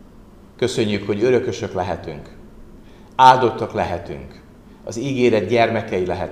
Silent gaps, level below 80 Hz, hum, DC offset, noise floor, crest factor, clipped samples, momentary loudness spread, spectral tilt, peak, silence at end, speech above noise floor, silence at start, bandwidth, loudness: none; -46 dBFS; none; 0.1%; -44 dBFS; 20 dB; under 0.1%; 20 LU; -5.5 dB/octave; 0 dBFS; 0 s; 26 dB; 0 s; 13 kHz; -19 LUFS